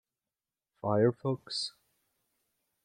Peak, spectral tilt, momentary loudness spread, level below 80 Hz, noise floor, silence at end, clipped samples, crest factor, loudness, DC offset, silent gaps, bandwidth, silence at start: -14 dBFS; -6 dB/octave; 11 LU; -78 dBFS; under -90 dBFS; 1.15 s; under 0.1%; 22 dB; -32 LUFS; under 0.1%; none; 10.5 kHz; 0.85 s